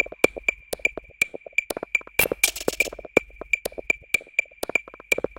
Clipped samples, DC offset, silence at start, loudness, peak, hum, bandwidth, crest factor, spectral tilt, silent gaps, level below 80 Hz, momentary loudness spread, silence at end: under 0.1%; under 0.1%; 0 s; -24 LUFS; 0 dBFS; none; 17 kHz; 26 dB; -1.5 dB/octave; none; -50 dBFS; 5 LU; 0.1 s